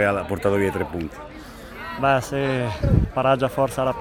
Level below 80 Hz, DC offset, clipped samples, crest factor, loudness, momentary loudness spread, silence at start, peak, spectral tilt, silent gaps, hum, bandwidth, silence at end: -34 dBFS; under 0.1%; under 0.1%; 18 dB; -22 LUFS; 16 LU; 0 s; -4 dBFS; -6.5 dB/octave; none; none; 18 kHz; 0 s